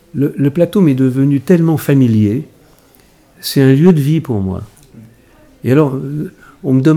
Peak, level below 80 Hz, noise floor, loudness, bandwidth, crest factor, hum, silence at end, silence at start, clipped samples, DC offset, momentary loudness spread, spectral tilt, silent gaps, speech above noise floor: 0 dBFS; -52 dBFS; -47 dBFS; -13 LUFS; 20 kHz; 14 dB; none; 0 s; 0.15 s; 0.2%; under 0.1%; 14 LU; -8 dB/octave; none; 36 dB